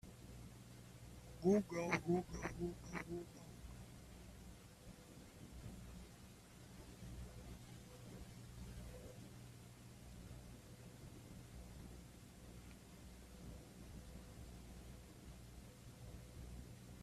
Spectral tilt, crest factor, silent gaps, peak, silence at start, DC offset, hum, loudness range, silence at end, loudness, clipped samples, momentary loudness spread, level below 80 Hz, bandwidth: -6 dB/octave; 26 dB; none; -22 dBFS; 0.05 s; under 0.1%; 60 Hz at -60 dBFS; 15 LU; 0 s; -50 LUFS; under 0.1%; 18 LU; -62 dBFS; 15.5 kHz